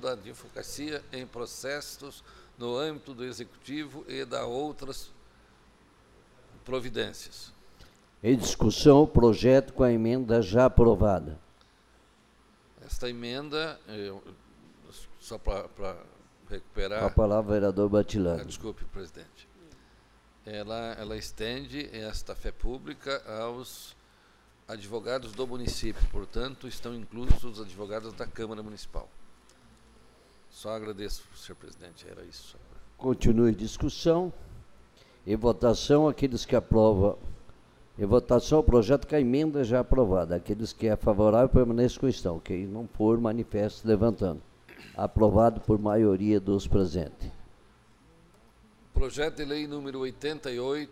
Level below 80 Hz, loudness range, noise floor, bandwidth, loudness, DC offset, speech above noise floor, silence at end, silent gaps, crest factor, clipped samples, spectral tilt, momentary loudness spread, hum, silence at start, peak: -38 dBFS; 15 LU; -61 dBFS; 15 kHz; -27 LUFS; under 0.1%; 34 dB; 0.05 s; none; 24 dB; under 0.1%; -6.5 dB/octave; 21 LU; none; 0 s; -4 dBFS